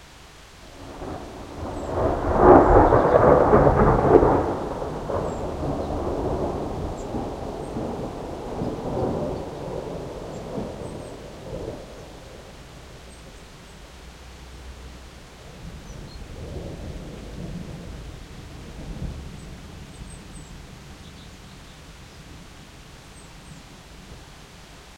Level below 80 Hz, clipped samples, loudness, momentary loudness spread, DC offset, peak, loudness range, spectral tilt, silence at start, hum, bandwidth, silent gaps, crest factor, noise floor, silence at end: -36 dBFS; under 0.1%; -22 LUFS; 27 LU; under 0.1%; 0 dBFS; 26 LU; -7.5 dB/octave; 0 s; none; 15.5 kHz; none; 24 dB; -46 dBFS; 0 s